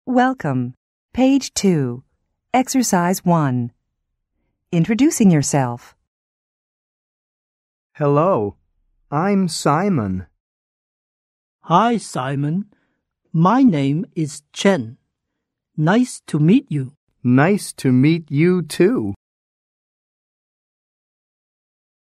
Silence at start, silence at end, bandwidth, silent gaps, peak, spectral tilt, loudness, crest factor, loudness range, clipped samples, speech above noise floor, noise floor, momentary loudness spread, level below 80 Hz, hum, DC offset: 0.05 s; 2.85 s; 15 kHz; 0.77-1.09 s, 6.07-7.90 s, 10.40-11.59 s, 16.97-17.07 s; 0 dBFS; -6 dB/octave; -18 LUFS; 20 dB; 5 LU; under 0.1%; 62 dB; -79 dBFS; 11 LU; -56 dBFS; none; under 0.1%